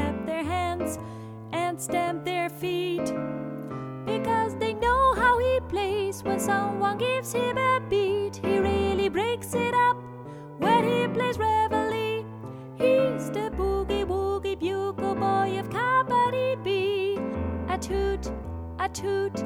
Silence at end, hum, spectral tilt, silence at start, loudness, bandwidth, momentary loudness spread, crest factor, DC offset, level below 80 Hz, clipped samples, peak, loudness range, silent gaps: 0 s; none; -5 dB/octave; 0 s; -26 LUFS; 18 kHz; 11 LU; 16 dB; under 0.1%; -44 dBFS; under 0.1%; -10 dBFS; 4 LU; none